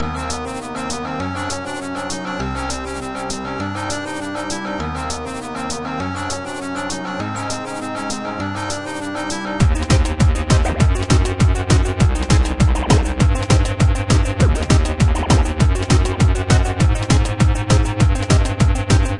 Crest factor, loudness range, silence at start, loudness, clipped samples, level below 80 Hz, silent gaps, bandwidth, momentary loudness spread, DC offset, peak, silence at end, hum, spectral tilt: 16 dB; 8 LU; 0 s; -19 LUFS; under 0.1%; -22 dBFS; none; 11.5 kHz; 9 LU; 0.5%; 0 dBFS; 0 s; none; -5.5 dB/octave